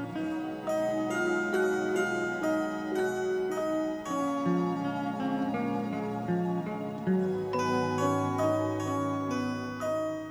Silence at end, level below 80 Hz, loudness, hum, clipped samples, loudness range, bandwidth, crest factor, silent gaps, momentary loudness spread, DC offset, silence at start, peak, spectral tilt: 0 s; -64 dBFS; -31 LUFS; none; under 0.1%; 1 LU; over 20 kHz; 14 dB; none; 5 LU; under 0.1%; 0 s; -16 dBFS; -6.5 dB/octave